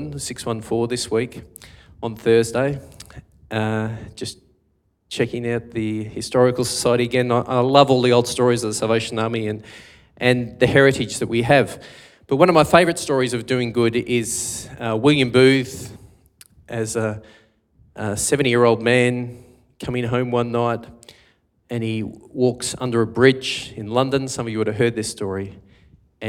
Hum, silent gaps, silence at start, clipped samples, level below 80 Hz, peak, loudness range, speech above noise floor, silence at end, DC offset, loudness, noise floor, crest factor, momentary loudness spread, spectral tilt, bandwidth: none; none; 0 s; under 0.1%; -52 dBFS; 0 dBFS; 6 LU; 46 dB; 0 s; under 0.1%; -20 LUFS; -65 dBFS; 20 dB; 16 LU; -5 dB/octave; 16.5 kHz